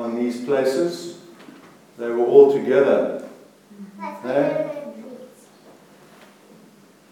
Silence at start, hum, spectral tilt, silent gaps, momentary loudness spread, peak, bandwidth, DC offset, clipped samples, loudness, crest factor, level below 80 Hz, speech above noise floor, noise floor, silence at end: 0 s; 50 Hz at -55 dBFS; -6 dB/octave; none; 26 LU; 0 dBFS; 13.5 kHz; under 0.1%; under 0.1%; -19 LUFS; 22 dB; -86 dBFS; 32 dB; -50 dBFS; 1.85 s